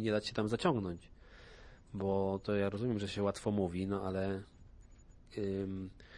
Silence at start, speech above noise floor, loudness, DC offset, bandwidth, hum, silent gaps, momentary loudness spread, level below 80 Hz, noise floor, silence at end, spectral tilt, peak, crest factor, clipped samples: 0 s; 22 dB; -37 LUFS; under 0.1%; 11.5 kHz; none; none; 15 LU; -60 dBFS; -58 dBFS; 0 s; -6.5 dB/octave; -18 dBFS; 20 dB; under 0.1%